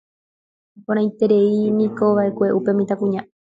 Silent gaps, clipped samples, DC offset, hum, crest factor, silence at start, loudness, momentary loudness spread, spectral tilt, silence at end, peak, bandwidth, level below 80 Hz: none; under 0.1%; under 0.1%; none; 14 dB; 0.9 s; -19 LUFS; 7 LU; -9 dB/octave; 0.2 s; -4 dBFS; 7.4 kHz; -64 dBFS